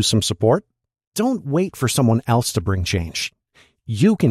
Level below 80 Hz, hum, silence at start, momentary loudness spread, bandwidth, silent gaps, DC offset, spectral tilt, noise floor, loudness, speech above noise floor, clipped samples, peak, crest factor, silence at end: -48 dBFS; none; 0 s; 9 LU; 15 kHz; 1.07-1.12 s; under 0.1%; -5 dB/octave; -57 dBFS; -20 LUFS; 38 dB; under 0.1%; -4 dBFS; 16 dB; 0 s